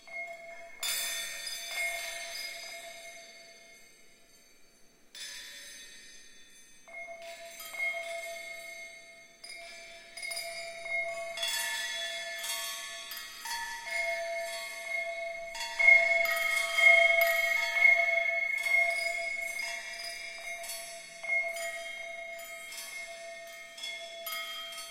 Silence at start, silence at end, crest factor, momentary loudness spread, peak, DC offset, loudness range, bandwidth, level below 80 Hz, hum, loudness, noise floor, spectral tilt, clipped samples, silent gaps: 0 s; 0 s; 22 dB; 22 LU; -10 dBFS; under 0.1%; 21 LU; 16.5 kHz; -68 dBFS; none; -29 LUFS; -59 dBFS; 2 dB/octave; under 0.1%; none